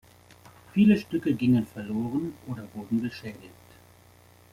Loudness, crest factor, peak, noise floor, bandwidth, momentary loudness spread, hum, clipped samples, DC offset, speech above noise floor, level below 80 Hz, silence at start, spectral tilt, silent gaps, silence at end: -27 LUFS; 18 dB; -10 dBFS; -55 dBFS; 15 kHz; 18 LU; 60 Hz at -50 dBFS; under 0.1%; under 0.1%; 29 dB; -62 dBFS; 0.75 s; -8 dB/octave; none; 1.05 s